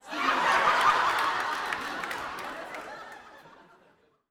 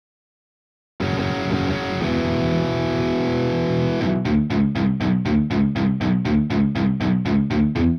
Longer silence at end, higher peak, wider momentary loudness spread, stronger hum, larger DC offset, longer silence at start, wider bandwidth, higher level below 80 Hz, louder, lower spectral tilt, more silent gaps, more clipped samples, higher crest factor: first, 0.8 s vs 0 s; about the same, -8 dBFS vs -8 dBFS; first, 19 LU vs 3 LU; neither; neither; second, 0.05 s vs 1 s; first, 19.5 kHz vs 6.8 kHz; second, -64 dBFS vs -40 dBFS; second, -26 LUFS vs -21 LUFS; second, -1.5 dB/octave vs -8 dB/octave; neither; neither; first, 22 dB vs 12 dB